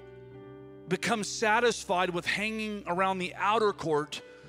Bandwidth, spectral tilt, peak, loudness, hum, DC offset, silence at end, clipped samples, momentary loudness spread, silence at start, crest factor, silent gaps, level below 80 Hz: 16 kHz; -3.5 dB/octave; -12 dBFS; -29 LUFS; none; under 0.1%; 0 s; under 0.1%; 21 LU; 0 s; 18 dB; none; -62 dBFS